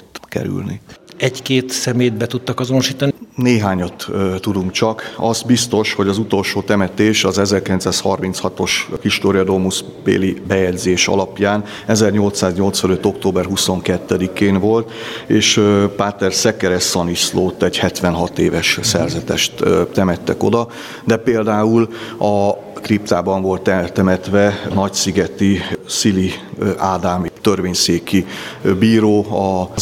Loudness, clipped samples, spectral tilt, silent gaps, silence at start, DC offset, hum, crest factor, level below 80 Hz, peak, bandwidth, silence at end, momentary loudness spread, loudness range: -16 LUFS; under 0.1%; -4.5 dB/octave; none; 0.15 s; under 0.1%; none; 16 dB; -50 dBFS; 0 dBFS; 16.5 kHz; 0 s; 6 LU; 2 LU